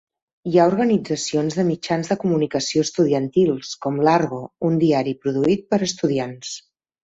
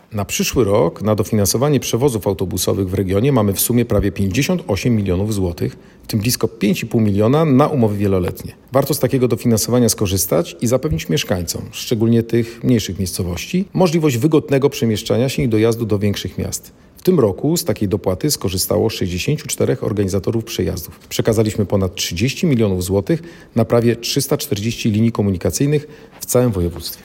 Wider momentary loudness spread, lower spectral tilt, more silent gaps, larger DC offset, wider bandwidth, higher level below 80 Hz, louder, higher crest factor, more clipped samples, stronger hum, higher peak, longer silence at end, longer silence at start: about the same, 8 LU vs 7 LU; about the same, -5.5 dB/octave vs -5.5 dB/octave; neither; neither; second, 8 kHz vs 17 kHz; second, -60 dBFS vs -42 dBFS; second, -20 LUFS vs -17 LUFS; about the same, 18 dB vs 16 dB; neither; neither; second, -4 dBFS vs 0 dBFS; first, 0.45 s vs 0 s; first, 0.45 s vs 0.1 s